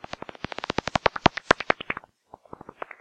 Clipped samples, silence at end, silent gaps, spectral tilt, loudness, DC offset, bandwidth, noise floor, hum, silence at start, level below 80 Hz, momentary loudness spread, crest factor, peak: under 0.1%; 1 s; none; -4.5 dB/octave; -25 LUFS; under 0.1%; 10 kHz; -52 dBFS; none; 0.95 s; -50 dBFS; 19 LU; 26 dB; -2 dBFS